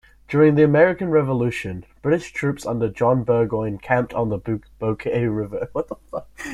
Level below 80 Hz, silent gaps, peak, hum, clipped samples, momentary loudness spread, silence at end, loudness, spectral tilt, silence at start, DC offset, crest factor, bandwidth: -48 dBFS; none; -2 dBFS; none; under 0.1%; 13 LU; 0 s; -21 LUFS; -8 dB/octave; 0.3 s; under 0.1%; 18 dB; 12.5 kHz